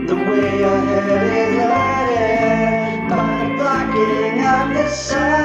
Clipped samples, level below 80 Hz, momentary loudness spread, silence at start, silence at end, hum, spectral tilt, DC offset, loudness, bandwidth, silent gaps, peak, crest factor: under 0.1%; -40 dBFS; 3 LU; 0 s; 0 s; none; -5.5 dB/octave; under 0.1%; -17 LUFS; 8.6 kHz; none; -4 dBFS; 12 dB